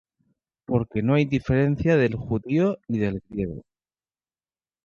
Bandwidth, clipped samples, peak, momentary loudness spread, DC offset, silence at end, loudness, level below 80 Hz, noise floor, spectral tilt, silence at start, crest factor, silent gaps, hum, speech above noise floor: 7 kHz; under 0.1%; -8 dBFS; 10 LU; under 0.1%; 1.25 s; -24 LUFS; -46 dBFS; under -90 dBFS; -9 dB/octave; 0.7 s; 16 dB; none; none; over 67 dB